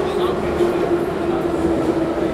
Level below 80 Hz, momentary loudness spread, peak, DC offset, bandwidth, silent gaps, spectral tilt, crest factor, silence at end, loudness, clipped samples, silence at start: -38 dBFS; 2 LU; -6 dBFS; under 0.1%; 13.5 kHz; none; -7 dB/octave; 12 dB; 0 s; -19 LUFS; under 0.1%; 0 s